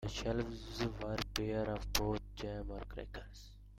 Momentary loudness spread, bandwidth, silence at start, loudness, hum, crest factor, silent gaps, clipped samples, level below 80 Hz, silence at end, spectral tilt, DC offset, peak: 13 LU; 16.5 kHz; 0 s; -40 LUFS; none; 26 dB; none; under 0.1%; -48 dBFS; 0 s; -4.5 dB/octave; under 0.1%; -16 dBFS